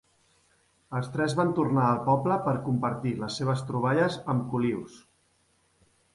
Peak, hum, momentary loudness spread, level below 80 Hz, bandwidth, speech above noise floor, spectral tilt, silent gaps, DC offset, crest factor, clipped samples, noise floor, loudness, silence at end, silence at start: -10 dBFS; none; 8 LU; -62 dBFS; 11.5 kHz; 41 dB; -7 dB/octave; none; under 0.1%; 18 dB; under 0.1%; -68 dBFS; -27 LUFS; 1.15 s; 0.9 s